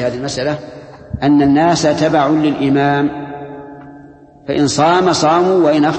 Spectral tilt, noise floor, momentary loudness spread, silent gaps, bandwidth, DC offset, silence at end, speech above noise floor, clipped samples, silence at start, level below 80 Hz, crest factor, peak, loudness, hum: -5.5 dB/octave; -40 dBFS; 18 LU; none; 8.8 kHz; under 0.1%; 0 s; 27 dB; under 0.1%; 0 s; -44 dBFS; 14 dB; 0 dBFS; -13 LUFS; none